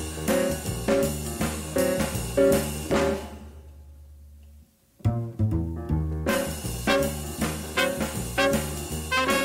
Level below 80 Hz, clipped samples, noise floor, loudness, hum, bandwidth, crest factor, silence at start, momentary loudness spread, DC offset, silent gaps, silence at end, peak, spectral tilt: -38 dBFS; under 0.1%; -54 dBFS; -26 LUFS; none; 16 kHz; 16 dB; 0 s; 7 LU; under 0.1%; none; 0 s; -10 dBFS; -4.5 dB/octave